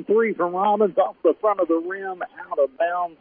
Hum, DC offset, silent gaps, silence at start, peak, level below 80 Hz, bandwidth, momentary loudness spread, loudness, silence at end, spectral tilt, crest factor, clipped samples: none; under 0.1%; none; 0 s; -8 dBFS; -72 dBFS; 3.6 kHz; 10 LU; -22 LUFS; 0.05 s; -10 dB/octave; 14 dB; under 0.1%